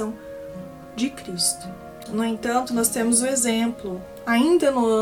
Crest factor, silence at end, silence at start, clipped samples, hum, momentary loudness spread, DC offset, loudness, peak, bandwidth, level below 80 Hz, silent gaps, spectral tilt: 18 dB; 0 s; 0 s; under 0.1%; none; 18 LU; under 0.1%; -22 LUFS; -6 dBFS; 18 kHz; -54 dBFS; none; -3 dB/octave